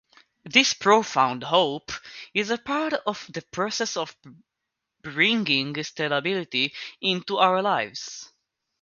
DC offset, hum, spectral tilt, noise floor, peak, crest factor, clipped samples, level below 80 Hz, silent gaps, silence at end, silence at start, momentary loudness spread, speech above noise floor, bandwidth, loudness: under 0.1%; none; -3 dB/octave; -83 dBFS; -2 dBFS; 24 dB; under 0.1%; -68 dBFS; none; 0.55 s; 0.45 s; 15 LU; 58 dB; 7.4 kHz; -23 LUFS